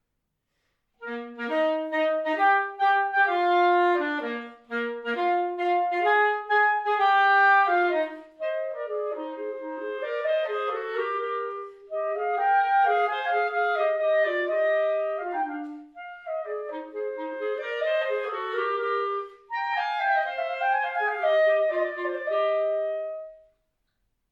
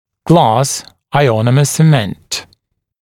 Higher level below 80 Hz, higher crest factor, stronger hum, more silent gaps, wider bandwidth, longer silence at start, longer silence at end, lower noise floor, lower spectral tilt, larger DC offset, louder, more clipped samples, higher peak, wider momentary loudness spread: second, -76 dBFS vs -48 dBFS; about the same, 16 dB vs 14 dB; neither; neither; second, 7.2 kHz vs 16.5 kHz; first, 1 s vs 0.25 s; first, 0.95 s vs 0.6 s; first, -79 dBFS vs -58 dBFS; second, -3.5 dB/octave vs -5.5 dB/octave; neither; second, -25 LUFS vs -13 LUFS; neither; second, -10 dBFS vs 0 dBFS; about the same, 13 LU vs 12 LU